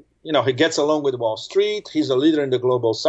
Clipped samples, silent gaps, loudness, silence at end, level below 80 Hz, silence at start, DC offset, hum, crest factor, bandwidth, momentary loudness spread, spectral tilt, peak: under 0.1%; none; -20 LUFS; 0 s; -66 dBFS; 0.25 s; under 0.1%; none; 14 dB; 8.2 kHz; 5 LU; -5 dB/octave; -4 dBFS